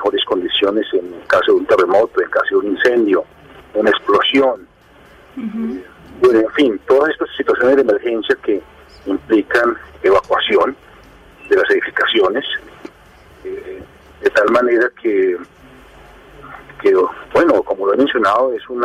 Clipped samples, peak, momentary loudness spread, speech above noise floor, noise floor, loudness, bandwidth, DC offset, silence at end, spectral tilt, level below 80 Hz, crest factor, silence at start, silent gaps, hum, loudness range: under 0.1%; -2 dBFS; 14 LU; 30 dB; -45 dBFS; -15 LUFS; 10.5 kHz; under 0.1%; 0 s; -5 dB/octave; -50 dBFS; 14 dB; 0 s; none; none; 3 LU